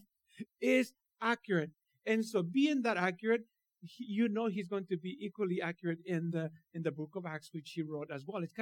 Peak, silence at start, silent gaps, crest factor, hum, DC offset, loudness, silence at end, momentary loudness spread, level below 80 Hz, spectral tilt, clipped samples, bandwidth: -18 dBFS; 0.35 s; none; 18 dB; none; under 0.1%; -36 LUFS; 0 s; 12 LU; under -90 dBFS; -6.5 dB/octave; under 0.1%; 18 kHz